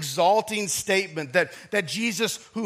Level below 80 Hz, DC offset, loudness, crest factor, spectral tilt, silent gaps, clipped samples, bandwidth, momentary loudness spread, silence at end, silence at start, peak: -70 dBFS; under 0.1%; -24 LUFS; 18 dB; -3 dB/octave; none; under 0.1%; 15.5 kHz; 6 LU; 0 s; 0 s; -6 dBFS